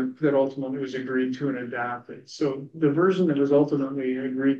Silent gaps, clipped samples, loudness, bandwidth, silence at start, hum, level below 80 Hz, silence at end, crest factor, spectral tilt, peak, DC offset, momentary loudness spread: none; under 0.1%; -25 LUFS; 7.4 kHz; 0 s; none; -76 dBFS; 0 s; 14 dB; -7.5 dB/octave; -10 dBFS; under 0.1%; 10 LU